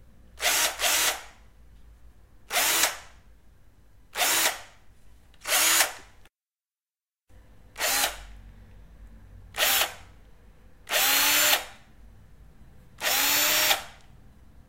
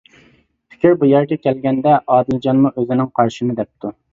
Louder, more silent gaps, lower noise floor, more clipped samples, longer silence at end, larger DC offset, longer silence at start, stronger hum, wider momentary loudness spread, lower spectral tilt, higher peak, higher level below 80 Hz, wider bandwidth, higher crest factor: second, -23 LUFS vs -16 LUFS; neither; first, under -90 dBFS vs -54 dBFS; neither; first, 0.75 s vs 0.2 s; first, 0.2% vs under 0.1%; second, 0.4 s vs 0.85 s; neither; first, 19 LU vs 8 LU; second, 1 dB/octave vs -8.5 dB/octave; second, -4 dBFS vs 0 dBFS; about the same, -54 dBFS vs -54 dBFS; first, 16 kHz vs 7.6 kHz; first, 24 dB vs 16 dB